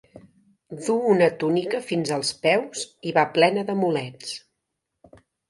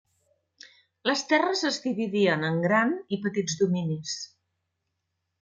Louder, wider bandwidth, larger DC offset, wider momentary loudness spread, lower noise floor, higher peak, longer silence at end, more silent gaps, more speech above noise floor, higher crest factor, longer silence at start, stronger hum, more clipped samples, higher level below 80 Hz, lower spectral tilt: first, -23 LUFS vs -26 LUFS; first, 11.5 kHz vs 9.4 kHz; neither; first, 14 LU vs 8 LU; about the same, -80 dBFS vs -81 dBFS; first, -4 dBFS vs -10 dBFS; about the same, 1.1 s vs 1.15 s; neither; about the same, 58 dB vs 55 dB; about the same, 22 dB vs 18 dB; second, 0.15 s vs 1.05 s; neither; neither; about the same, -70 dBFS vs -72 dBFS; about the same, -4.5 dB/octave vs -4.5 dB/octave